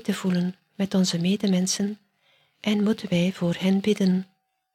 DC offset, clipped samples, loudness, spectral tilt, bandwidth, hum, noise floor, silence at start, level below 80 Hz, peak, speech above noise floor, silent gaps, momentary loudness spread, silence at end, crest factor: under 0.1%; under 0.1%; -24 LUFS; -5.5 dB/octave; 13.5 kHz; none; -65 dBFS; 0.05 s; -64 dBFS; -10 dBFS; 41 dB; none; 8 LU; 0.5 s; 14 dB